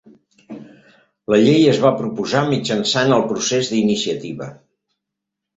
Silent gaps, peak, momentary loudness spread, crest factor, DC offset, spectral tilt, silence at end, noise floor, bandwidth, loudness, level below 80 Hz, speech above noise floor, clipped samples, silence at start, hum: none; -2 dBFS; 23 LU; 18 dB; under 0.1%; -5 dB/octave; 1.05 s; -81 dBFS; 8 kHz; -17 LUFS; -58 dBFS; 65 dB; under 0.1%; 0.5 s; none